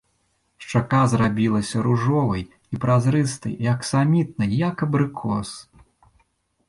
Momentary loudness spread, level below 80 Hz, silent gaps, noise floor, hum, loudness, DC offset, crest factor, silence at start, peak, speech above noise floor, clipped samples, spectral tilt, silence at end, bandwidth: 9 LU; -50 dBFS; none; -68 dBFS; none; -22 LUFS; under 0.1%; 16 dB; 0.6 s; -6 dBFS; 48 dB; under 0.1%; -7 dB/octave; 1.1 s; 11.5 kHz